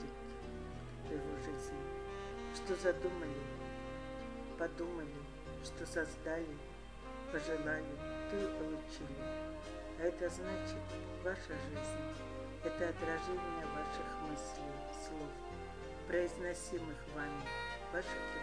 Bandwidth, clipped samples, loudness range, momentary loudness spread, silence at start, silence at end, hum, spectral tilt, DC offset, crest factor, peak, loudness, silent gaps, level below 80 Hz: 11 kHz; under 0.1%; 2 LU; 9 LU; 0 s; 0 s; none; -5 dB/octave; 0.1%; 22 dB; -22 dBFS; -43 LUFS; none; -54 dBFS